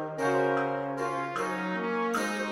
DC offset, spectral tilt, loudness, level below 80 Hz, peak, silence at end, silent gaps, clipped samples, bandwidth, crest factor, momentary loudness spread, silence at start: under 0.1%; -5 dB/octave; -30 LUFS; -70 dBFS; -16 dBFS; 0 s; none; under 0.1%; 16 kHz; 14 dB; 5 LU; 0 s